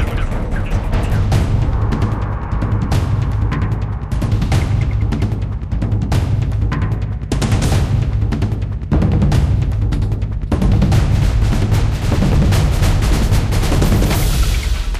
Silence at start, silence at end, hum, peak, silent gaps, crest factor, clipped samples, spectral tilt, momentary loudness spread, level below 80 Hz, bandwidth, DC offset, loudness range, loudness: 0 s; 0 s; none; -4 dBFS; none; 10 dB; under 0.1%; -6.5 dB/octave; 6 LU; -18 dBFS; 15.5 kHz; under 0.1%; 3 LU; -17 LUFS